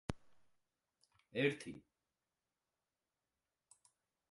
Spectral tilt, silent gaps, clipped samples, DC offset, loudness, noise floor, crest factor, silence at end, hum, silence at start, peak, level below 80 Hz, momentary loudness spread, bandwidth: -5.5 dB/octave; none; under 0.1%; under 0.1%; -41 LUFS; under -90 dBFS; 26 dB; 2.55 s; none; 0.1 s; -22 dBFS; -68 dBFS; 19 LU; 11.5 kHz